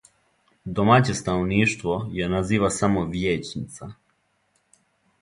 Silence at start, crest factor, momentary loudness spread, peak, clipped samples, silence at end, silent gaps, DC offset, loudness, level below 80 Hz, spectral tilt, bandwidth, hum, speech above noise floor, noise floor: 0.65 s; 22 dB; 17 LU; -2 dBFS; under 0.1%; 1.3 s; none; under 0.1%; -23 LUFS; -46 dBFS; -5.5 dB/octave; 11.5 kHz; none; 46 dB; -69 dBFS